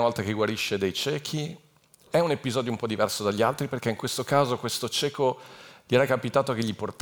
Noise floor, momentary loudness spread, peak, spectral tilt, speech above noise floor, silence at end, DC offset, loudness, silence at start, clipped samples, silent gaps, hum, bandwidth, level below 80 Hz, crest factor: -56 dBFS; 7 LU; -8 dBFS; -4.5 dB/octave; 30 dB; 0.1 s; under 0.1%; -27 LUFS; 0 s; under 0.1%; none; none; over 20 kHz; -68 dBFS; 20 dB